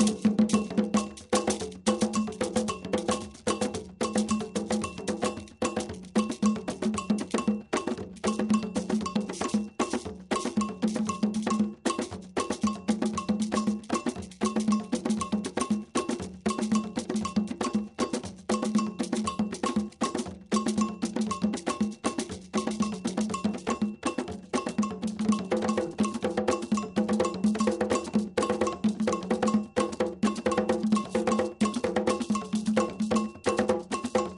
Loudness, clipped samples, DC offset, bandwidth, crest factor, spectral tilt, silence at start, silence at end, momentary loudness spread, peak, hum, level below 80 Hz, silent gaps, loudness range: -29 LUFS; under 0.1%; under 0.1%; 11.5 kHz; 18 dB; -5 dB/octave; 0 s; 0 s; 5 LU; -10 dBFS; none; -58 dBFS; none; 3 LU